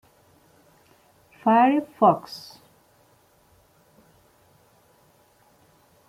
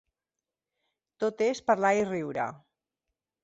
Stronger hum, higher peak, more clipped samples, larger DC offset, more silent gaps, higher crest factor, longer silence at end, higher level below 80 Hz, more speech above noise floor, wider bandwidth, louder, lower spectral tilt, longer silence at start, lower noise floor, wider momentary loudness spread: neither; first, -6 dBFS vs -10 dBFS; neither; neither; neither; about the same, 22 dB vs 20 dB; first, 3.7 s vs 0.85 s; about the same, -72 dBFS vs -72 dBFS; second, 40 dB vs 62 dB; first, 16 kHz vs 8 kHz; first, -21 LUFS vs -28 LUFS; first, -7 dB/octave vs -5 dB/octave; first, 1.45 s vs 1.2 s; second, -60 dBFS vs -90 dBFS; first, 21 LU vs 9 LU